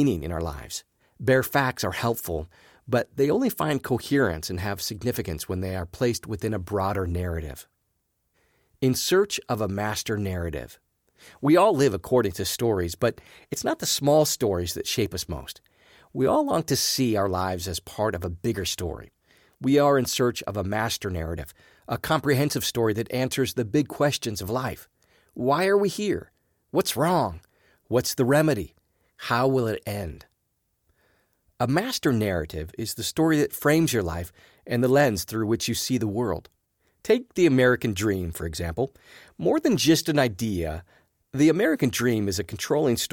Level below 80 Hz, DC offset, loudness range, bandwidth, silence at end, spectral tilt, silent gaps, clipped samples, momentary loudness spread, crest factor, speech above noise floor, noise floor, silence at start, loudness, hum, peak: -48 dBFS; under 0.1%; 4 LU; 19.5 kHz; 0.05 s; -5 dB/octave; none; under 0.1%; 13 LU; 18 dB; 50 dB; -75 dBFS; 0 s; -25 LUFS; none; -8 dBFS